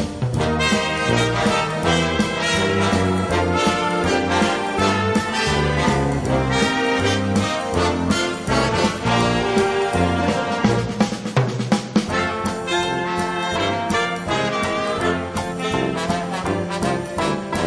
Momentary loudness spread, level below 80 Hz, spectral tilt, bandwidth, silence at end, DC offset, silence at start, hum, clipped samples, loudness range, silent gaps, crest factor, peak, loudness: 4 LU; -38 dBFS; -5 dB/octave; 11 kHz; 0 s; under 0.1%; 0 s; none; under 0.1%; 3 LU; none; 16 dB; -4 dBFS; -20 LUFS